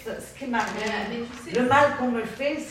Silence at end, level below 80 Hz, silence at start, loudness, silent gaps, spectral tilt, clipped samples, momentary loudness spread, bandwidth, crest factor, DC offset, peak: 0 s; -56 dBFS; 0 s; -25 LUFS; none; -4.5 dB/octave; under 0.1%; 14 LU; 15.5 kHz; 20 dB; under 0.1%; -6 dBFS